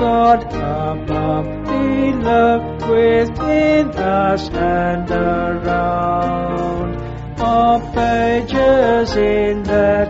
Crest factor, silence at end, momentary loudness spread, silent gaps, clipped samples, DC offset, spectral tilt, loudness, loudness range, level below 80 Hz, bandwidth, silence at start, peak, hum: 14 dB; 0 s; 7 LU; none; under 0.1%; under 0.1%; -5.5 dB/octave; -16 LUFS; 2 LU; -32 dBFS; 8 kHz; 0 s; -2 dBFS; none